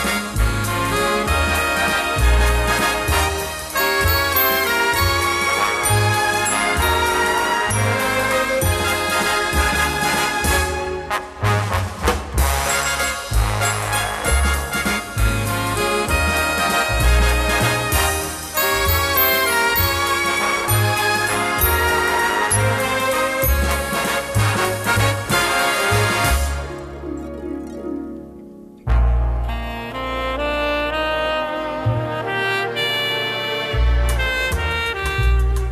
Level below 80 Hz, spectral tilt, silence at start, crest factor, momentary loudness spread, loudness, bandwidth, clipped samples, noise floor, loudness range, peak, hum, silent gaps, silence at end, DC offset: -26 dBFS; -3.5 dB/octave; 0 s; 16 dB; 7 LU; -18 LUFS; 14 kHz; under 0.1%; -39 dBFS; 5 LU; -4 dBFS; none; none; 0 s; under 0.1%